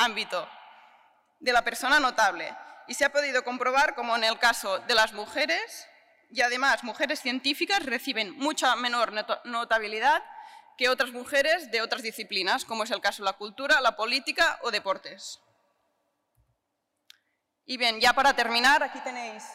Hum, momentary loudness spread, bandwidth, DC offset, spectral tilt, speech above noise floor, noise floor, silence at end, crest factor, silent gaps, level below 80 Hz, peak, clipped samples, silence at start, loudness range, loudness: none; 12 LU; 16 kHz; under 0.1%; -0.5 dB/octave; 53 dB; -80 dBFS; 0 s; 16 dB; none; -62 dBFS; -12 dBFS; under 0.1%; 0 s; 3 LU; -26 LUFS